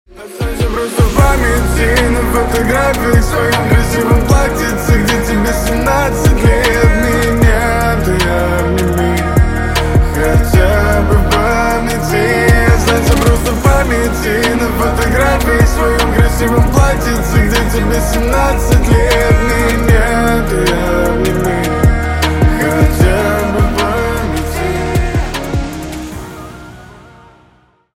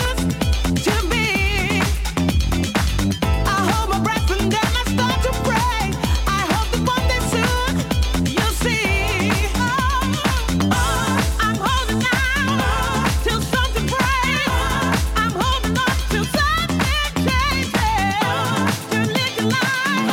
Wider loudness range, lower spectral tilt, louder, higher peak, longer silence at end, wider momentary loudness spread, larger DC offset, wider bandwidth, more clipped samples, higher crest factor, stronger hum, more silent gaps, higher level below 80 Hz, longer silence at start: about the same, 2 LU vs 1 LU; about the same, -5.5 dB/octave vs -4.5 dB/octave; first, -12 LUFS vs -19 LUFS; first, 0 dBFS vs -6 dBFS; first, 0.95 s vs 0 s; first, 6 LU vs 2 LU; neither; about the same, 16.5 kHz vs 17.5 kHz; neither; about the same, 12 dB vs 12 dB; neither; neither; first, -16 dBFS vs -26 dBFS; first, 0.15 s vs 0 s